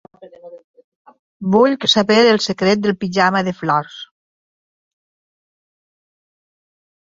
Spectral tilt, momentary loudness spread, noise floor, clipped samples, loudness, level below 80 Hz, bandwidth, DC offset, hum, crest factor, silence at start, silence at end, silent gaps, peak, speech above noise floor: -4.5 dB/octave; 9 LU; -39 dBFS; under 0.1%; -15 LUFS; -60 dBFS; 7.8 kHz; under 0.1%; none; 18 dB; 0.2 s; 3 s; 0.64-0.74 s, 0.84-1.05 s, 1.19-1.40 s; 0 dBFS; 24 dB